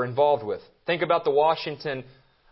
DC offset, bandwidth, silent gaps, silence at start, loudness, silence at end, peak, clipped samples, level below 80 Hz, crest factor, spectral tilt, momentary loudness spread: under 0.1%; 5.8 kHz; none; 0 s; -25 LUFS; 0.5 s; -8 dBFS; under 0.1%; -66 dBFS; 16 dB; -9.5 dB/octave; 11 LU